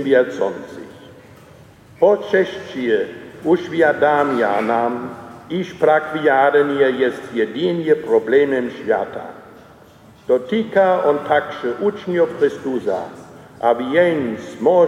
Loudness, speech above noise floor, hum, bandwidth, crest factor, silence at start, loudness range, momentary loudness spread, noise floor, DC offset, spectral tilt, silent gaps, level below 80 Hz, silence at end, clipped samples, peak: -18 LUFS; 28 dB; none; 11 kHz; 16 dB; 0 s; 3 LU; 12 LU; -45 dBFS; under 0.1%; -6.5 dB/octave; none; -62 dBFS; 0 s; under 0.1%; -2 dBFS